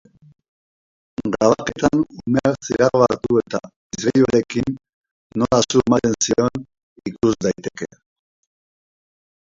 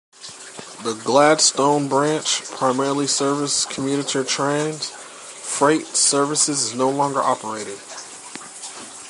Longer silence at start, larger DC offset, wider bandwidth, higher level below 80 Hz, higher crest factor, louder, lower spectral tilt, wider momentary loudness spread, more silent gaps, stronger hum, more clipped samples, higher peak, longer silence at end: first, 1.2 s vs 0.2 s; neither; second, 7.8 kHz vs 11.5 kHz; first, -48 dBFS vs -70 dBFS; about the same, 20 dB vs 18 dB; about the same, -19 LUFS vs -19 LUFS; first, -5 dB/octave vs -2.5 dB/octave; about the same, 17 LU vs 19 LU; first, 3.76-3.90 s, 4.89-5.01 s, 5.11-5.30 s, 6.83-6.96 s vs none; neither; neither; about the same, 0 dBFS vs -2 dBFS; first, 1.7 s vs 0 s